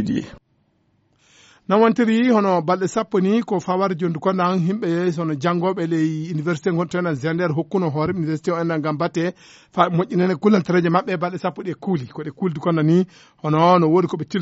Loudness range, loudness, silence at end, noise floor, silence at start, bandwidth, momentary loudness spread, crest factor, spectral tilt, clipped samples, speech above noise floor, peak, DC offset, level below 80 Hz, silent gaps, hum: 3 LU; -20 LUFS; 0 s; -64 dBFS; 0 s; 8 kHz; 9 LU; 18 dB; -6.5 dB/octave; under 0.1%; 44 dB; -2 dBFS; under 0.1%; -60 dBFS; none; none